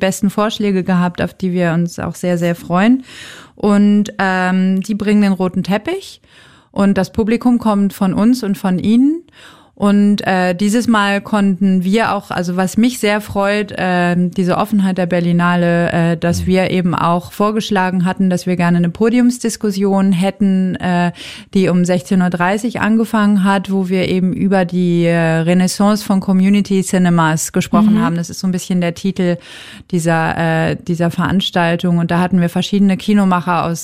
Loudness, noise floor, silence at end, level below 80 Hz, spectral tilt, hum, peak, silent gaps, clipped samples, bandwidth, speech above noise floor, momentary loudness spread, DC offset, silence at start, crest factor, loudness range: -15 LUFS; -42 dBFS; 0 s; -46 dBFS; -6 dB/octave; none; -2 dBFS; none; under 0.1%; 15.5 kHz; 28 dB; 5 LU; 0.2%; 0 s; 12 dB; 2 LU